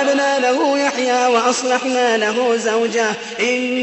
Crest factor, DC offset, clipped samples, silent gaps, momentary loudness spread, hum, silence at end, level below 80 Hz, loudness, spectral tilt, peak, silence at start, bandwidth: 14 dB; under 0.1%; under 0.1%; none; 3 LU; none; 0 s; -68 dBFS; -17 LUFS; -2 dB/octave; -4 dBFS; 0 s; 8.4 kHz